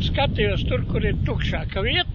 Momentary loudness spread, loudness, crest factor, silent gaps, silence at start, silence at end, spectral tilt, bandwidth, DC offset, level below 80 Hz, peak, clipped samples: 4 LU; -23 LUFS; 16 dB; none; 0 s; 0 s; -7 dB/octave; 7 kHz; under 0.1%; -28 dBFS; -6 dBFS; under 0.1%